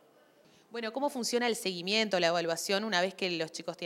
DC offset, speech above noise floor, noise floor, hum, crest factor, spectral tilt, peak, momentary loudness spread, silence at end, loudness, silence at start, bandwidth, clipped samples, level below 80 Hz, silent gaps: under 0.1%; 31 dB; -62 dBFS; none; 22 dB; -3 dB/octave; -12 dBFS; 9 LU; 0 s; -31 LUFS; 0.7 s; 16.5 kHz; under 0.1%; -86 dBFS; none